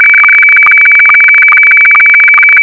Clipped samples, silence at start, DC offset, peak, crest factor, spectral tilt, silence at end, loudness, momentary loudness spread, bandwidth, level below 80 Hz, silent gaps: under 0.1%; 0 s; under 0.1%; 0 dBFS; 4 dB; -1 dB/octave; 0 s; 0 LUFS; 0 LU; 5.4 kHz; -56 dBFS; none